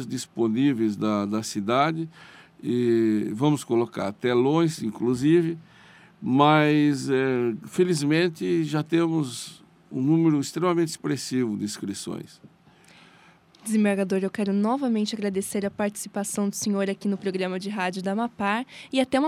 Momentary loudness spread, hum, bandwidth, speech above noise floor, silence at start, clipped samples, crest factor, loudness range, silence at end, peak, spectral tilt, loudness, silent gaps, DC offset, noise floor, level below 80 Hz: 10 LU; none; 15.5 kHz; 31 dB; 0 s; under 0.1%; 20 dB; 5 LU; 0 s; -4 dBFS; -5.5 dB/octave; -25 LUFS; none; under 0.1%; -55 dBFS; -68 dBFS